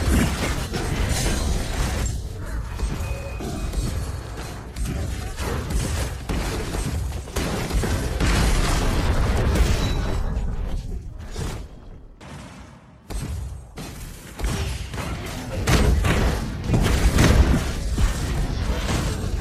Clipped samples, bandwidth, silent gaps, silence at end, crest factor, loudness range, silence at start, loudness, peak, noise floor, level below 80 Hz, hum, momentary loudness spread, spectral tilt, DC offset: under 0.1%; 15.5 kHz; none; 0 s; 18 dB; 12 LU; 0 s; -25 LUFS; -4 dBFS; -44 dBFS; -26 dBFS; none; 15 LU; -5 dB/octave; under 0.1%